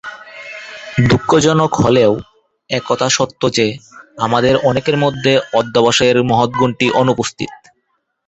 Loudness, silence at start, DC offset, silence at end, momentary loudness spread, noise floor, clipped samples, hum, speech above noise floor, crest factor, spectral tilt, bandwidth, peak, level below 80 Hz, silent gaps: -14 LUFS; 0.05 s; under 0.1%; 0.75 s; 15 LU; -67 dBFS; under 0.1%; none; 53 dB; 14 dB; -5 dB/octave; 8.2 kHz; 0 dBFS; -44 dBFS; none